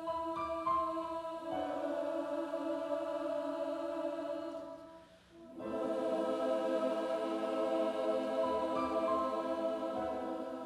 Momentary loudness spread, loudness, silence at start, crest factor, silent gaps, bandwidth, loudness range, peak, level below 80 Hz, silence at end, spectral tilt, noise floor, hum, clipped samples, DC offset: 7 LU; -37 LUFS; 0 s; 14 dB; none; 13 kHz; 5 LU; -22 dBFS; -70 dBFS; 0 s; -5.5 dB/octave; -57 dBFS; none; under 0.1%; under 0.1%